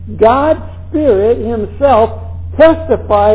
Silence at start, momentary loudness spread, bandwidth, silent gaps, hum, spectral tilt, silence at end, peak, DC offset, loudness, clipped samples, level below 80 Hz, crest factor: 0 s; 10 LU; 4 kHz; none; none; -10.5 dB/octave; 0 s; 0 dBFS; 1%; -11 LUFS; 1%; -28 dBFS; 10 dB